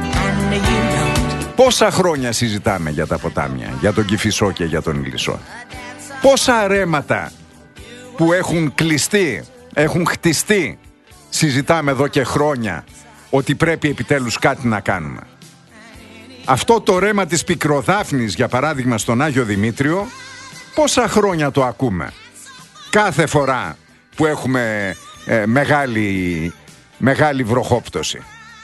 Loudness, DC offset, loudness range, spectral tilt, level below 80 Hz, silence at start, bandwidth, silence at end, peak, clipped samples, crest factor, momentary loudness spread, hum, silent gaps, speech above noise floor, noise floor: -17 LUFS; under 0.1%; 3 LU; -4.5 dB/octave; -38 dBFS; 0 s; 12.5 kHz; 0 s; 0 dBFS; under 0.1%; 18 dB; 14 LU; none; none; 26 dB; -43 dBFS